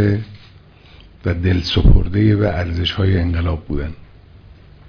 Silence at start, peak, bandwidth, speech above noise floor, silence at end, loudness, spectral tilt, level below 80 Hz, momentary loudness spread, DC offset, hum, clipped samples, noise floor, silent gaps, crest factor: 0 s; 0 dBFS; 5.4 kHz; 29 dB; 0.85 s; -18 LUFS; -8 dB/octave; -22 dBFS; 11 LU; under 0.1%; none; under 0.1%; -44 dBFS; none; 16 dB